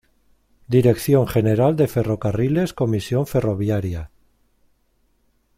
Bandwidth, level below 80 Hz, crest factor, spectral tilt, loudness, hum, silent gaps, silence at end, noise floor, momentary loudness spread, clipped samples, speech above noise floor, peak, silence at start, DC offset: 16 kHz; -46 dBFS; 18 dB; -7.5 dB/octave; -20 LUFS; none; none; 1.5 s; -64 dBFS; 6 LU; under 0.1%; 45 dB; -4 dBFS; 0.7 s; under 0.1%